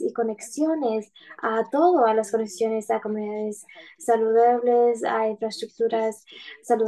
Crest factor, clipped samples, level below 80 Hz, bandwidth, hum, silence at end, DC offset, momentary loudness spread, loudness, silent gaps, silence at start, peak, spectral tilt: 16 dB; under 0.1%; -78 dBFS; 12.5 kHz; none; 0 s; under 0.1%; 13 LU; -23 LUFS; none; 0 s; -8 dBFS; -4.5 dB/octave